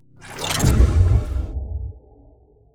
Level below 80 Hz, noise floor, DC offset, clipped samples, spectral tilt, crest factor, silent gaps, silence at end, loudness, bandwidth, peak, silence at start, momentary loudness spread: -22 dBFS; -52 dBFS; under 0.1%; under 0.1%; -5 dB/octave; 18 dB; none; 0.75 s; -20 LUFS; 16.5 kHz; -2 dBFS; 0.2 s; 17 LU